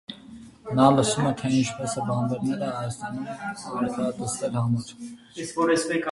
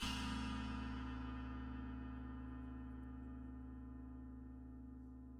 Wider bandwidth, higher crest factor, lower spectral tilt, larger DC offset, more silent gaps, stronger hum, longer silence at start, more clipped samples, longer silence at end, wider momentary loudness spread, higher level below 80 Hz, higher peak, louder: second, 11.5 kHz vs 14 kHz; first, 22 dB vs 16 dB; about the same, -5.5 dB/octave vs -5 dB/octave; neither; neither; neither; about the same, 0.1 s vs 0 s; neither; about the same, 0 s vs 0 s; first, 19 LU vs 11 LU; second, -58 dBFS vs -52 dBFS; first, -4 dBFS vs -32 dBFS; first, -25 LUFS vs -50 LUFS